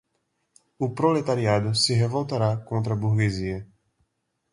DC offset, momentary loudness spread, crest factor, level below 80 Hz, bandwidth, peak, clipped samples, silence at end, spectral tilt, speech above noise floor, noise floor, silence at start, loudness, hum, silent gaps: under 0.1%; 9 LU; 18 dB; -52 dBFS; 11.5 kHz; -8 dBFS; under 0.1%; 0.9 s; -5.5 dB/octave; 51 dB; -75 dBFS; 0.8 s; -24 LUFS; none; none